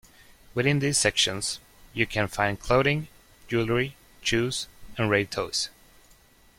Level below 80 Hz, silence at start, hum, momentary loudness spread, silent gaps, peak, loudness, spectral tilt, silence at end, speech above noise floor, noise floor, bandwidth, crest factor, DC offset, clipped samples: -50 dBFS; 0.55 s; none; 11 LU; none; -6 dBFS; -26 LUFS; -3.5 dB/octave; 0.9 s; 31 dB; -57 dBFS; 16.5 kHz; 20 dB; under 0.1%; under 0.1%